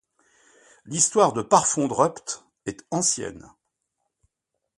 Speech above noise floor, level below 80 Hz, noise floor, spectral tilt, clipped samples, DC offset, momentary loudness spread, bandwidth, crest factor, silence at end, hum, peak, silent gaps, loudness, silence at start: 58 dB; -62 dBFS; -81 dBFS; -3.5 dB/octave; under 0.1%; under 0.1%; 16 LU; 11.5 kHz; 24 dB; 1.4 s; none; -2 dBFS; none; -22 LUFS; 0.85 s